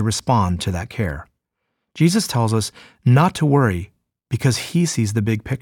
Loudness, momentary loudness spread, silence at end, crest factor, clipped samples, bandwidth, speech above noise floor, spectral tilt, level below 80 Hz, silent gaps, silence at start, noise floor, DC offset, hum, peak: -19 LUFS; 11 LU; 0.05 s; 16 dB; under 0.1%; 17.5 kHz; 58 dB; -5.5 dB/octave; -44 dBFS; none; 0 s; -76 dBFS; under 0.1%; none; -4 dBFS